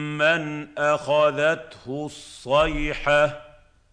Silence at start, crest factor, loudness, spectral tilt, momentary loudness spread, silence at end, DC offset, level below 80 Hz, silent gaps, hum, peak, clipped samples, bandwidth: 0 s; 16 dB; -22 LUFS; -5 dB/octave; 14 LU; 0.45 s; under 0.1%; -40 dBFS; none; none; -6 dBFS; under 0.1%; 10.5 kHz